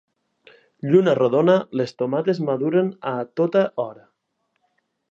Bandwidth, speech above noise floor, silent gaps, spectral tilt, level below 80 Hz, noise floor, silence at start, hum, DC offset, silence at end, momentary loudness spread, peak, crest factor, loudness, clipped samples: 7.6 kHz; 54 dB; none; -8 dB/octave; -74 dBFS; -73 dBFS; 0.85 s; none; under 0.1%; 1.2 s; 10 LU; -4 dBFS; 18 dB; -21 LUFS; under 0.1%